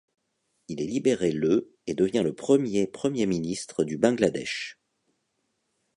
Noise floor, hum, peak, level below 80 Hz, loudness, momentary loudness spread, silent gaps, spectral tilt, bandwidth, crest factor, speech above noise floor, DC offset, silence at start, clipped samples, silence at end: -76 dBFS; none; -6 dBFS; -62 dBFS; -26 LUFS; 10 LU; none; -5.5 dB/octave; 11 kHz; 22 dB; 51 dB; under 0.1%; 0.7 s; under 0.1%; 1.25 s